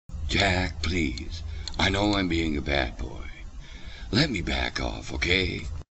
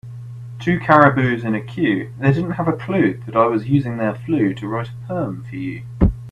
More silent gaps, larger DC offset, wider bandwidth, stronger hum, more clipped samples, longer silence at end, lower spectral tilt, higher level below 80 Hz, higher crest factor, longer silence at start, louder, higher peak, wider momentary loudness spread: neither; neither; about the same, 8.4 kHz vs 9 kHz; neither; neither; about the same, 0.1 s vs 0 s; second, -4.5 dB/octave vs -9 dB/octave; about the same, -36 dBFS vs -34 dBFS; about the same, 20 dB vs 18 dB; about the same, 0.1 s vs 0.05 s; second, -26 LUFS vs -19 LUFS; second, -6 dBFS vs 0 dBFS; first, 18 LU vs 14 LU